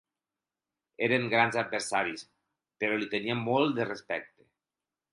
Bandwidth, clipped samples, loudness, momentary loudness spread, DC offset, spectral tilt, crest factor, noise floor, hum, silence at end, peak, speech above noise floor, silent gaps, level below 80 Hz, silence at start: 11.5 kHz; under 0.1%; -29 LUFS; 10 LU; under 0.1%; -4.5 dB/octave; 22 dB; under -90 dBFS; none; 0.85 s; -10 dBFS; over 60 dB; none; -74 dBFS; 1 s